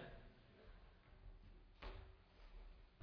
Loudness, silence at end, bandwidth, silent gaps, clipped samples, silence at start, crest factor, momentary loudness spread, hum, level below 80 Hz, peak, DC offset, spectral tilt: -64 LUFS; 0 s; 5.4 kHz; none; under 0.1%; 0 s; 26 dB; 9 LU; none; -62 dBFS; -32 dBFS; under 0.1%; -4.5 dB/octave